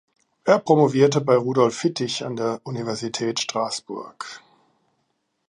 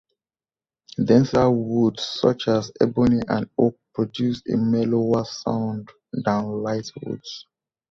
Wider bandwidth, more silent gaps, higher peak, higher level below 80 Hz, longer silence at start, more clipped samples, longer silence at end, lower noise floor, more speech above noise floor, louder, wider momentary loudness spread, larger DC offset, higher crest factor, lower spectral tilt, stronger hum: first, 11 kHz vs 7.4 kHz; neither; about the same, -2 dBFS vs -4 dBFS; second, -70 dBFS vs -52 dBFS; second, 0.45 s vs 1 s; neither; first, 1.1 s vs 0.5 s; second, -72 dBFS vs under -90 dBFS; second, 51 dB vs over 69 dB; about the same, -21 LUFS vs -22 LUFS; about the same, 16 LU vs 14 LU; neither; about the same, 20 dB vs 20 dB; second, -5 dB/octave vs -7 dB/octave; neither